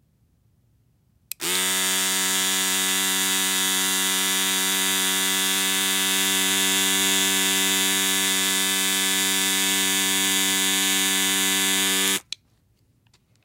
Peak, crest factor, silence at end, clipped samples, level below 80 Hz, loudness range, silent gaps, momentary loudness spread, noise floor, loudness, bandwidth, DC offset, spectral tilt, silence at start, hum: -8 dBFS; 16 dB; 1.25 s; under 0.1%; -68 dBFS; 2 LU; none; 2 LU; -63 dBFS; -19 LUFS; 16 kHz; under 0.1%; 0 dB/octave; 1.4 s; none